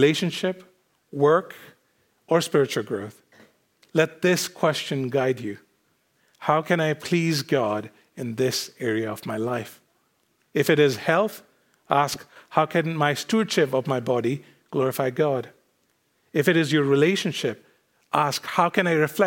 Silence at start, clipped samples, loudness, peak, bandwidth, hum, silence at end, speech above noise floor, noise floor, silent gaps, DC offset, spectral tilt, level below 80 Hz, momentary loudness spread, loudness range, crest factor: 0 s; under 0.1%; -24 LUFS; -4 dBFS; 17 kHz; none; 0 s; 46 dB; -68 dBFS; none; under 0.1%; -5 dB/octave; -74 dBFS; 12 LU; 3 LU; 20 dB